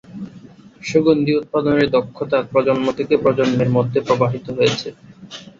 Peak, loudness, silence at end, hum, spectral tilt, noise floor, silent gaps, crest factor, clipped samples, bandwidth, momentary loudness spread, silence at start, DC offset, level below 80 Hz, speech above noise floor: -2 dBFS; -18 LUFS; 0.15 s; none; -6.5 dB/octave; -42 dBFS; none; 16 dB; under 0.1%; 7.6 kHz; 17 LU; 0.1 s; under 0.1%; -52 dBFS; 25 dB